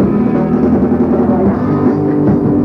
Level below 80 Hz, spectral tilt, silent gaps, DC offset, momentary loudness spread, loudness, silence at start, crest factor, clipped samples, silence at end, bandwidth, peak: -32 dBFS; -11.5 dB/octave; none; under 0.1%; 1 LU; -12 LUFS; 0 s; 12 dB; under 0.1%; 0 s; 5.2 kHz; 0 dBFS